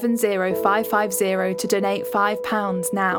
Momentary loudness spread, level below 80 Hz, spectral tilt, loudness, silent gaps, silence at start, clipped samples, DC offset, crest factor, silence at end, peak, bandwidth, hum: 3 LU; -62 dBFS; -4 dB/octave; -21 LUFS; none; 0 s; under 0.1%; under 0.1%; 18 dB; 0 s; -4 dBFS; 19 kHz; none